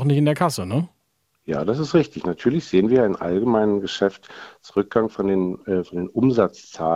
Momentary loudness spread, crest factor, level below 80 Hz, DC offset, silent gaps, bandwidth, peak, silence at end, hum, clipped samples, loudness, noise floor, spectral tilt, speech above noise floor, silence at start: 9 LU; 18 dB; -56 dBFS; under 0.1%; none; 14.5 kHz; -4 dBFS; 0 s; none; under 0.1%; -21 LUFS; -70 dBFS; -7 dB/octave; 49 dB; 0 s